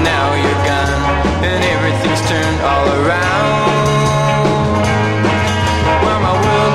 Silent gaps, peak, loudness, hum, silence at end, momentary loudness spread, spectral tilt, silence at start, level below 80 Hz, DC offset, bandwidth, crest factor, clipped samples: none; -2 dBFS; -14 LUFS; none; 0 s; 2 LU; -5.5 dB/octave; 0 s; -28 dBFS; 0.7%; 14.5 kHz; 12 dB; under 0.1%